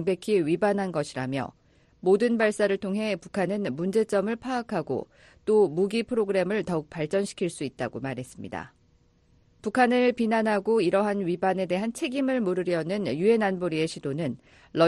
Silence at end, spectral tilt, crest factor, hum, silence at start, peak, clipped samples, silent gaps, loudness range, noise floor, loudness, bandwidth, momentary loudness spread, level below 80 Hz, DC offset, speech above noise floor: 0 s; -6 dB/octave; 18 dB; none; 0 s; -8 dBFS; under 0.1%; none; 4 LU; -63 dBFS; -26 LUFS; 11.5 kHz; 11 LU; -62 dBFS; under 0.1%; 37 dB